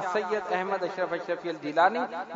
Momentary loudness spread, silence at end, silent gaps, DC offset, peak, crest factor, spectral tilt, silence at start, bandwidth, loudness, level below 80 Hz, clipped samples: 8 LU; 0 s; none; under 0.1%; -8 dBFS; 20 dB; -5 dB/octave; 0 s; 7.8 kHz; -28 LUFS; -76 dBFS; under 0.1%